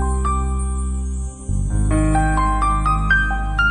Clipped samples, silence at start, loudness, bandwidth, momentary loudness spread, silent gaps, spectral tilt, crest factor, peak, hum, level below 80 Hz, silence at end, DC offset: under 0.1%; 0 s; -20 LUFS; 9.8 kHz; 8 LU; none; -5.5 dB/octave; 12 dB; -6 dBFS; none; -20 dBFS; 0 s; under 0.1%